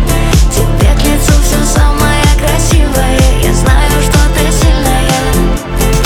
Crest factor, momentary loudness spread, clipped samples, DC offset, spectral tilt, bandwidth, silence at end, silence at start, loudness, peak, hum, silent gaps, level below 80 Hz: 8 dB; 2 LU; under 0.1%; under 0.1%; -4.5 dB/octave; 17 kHz; 0 s; 0 s; -10 LUFS; 0 dBFS; none; none; -10 dBFS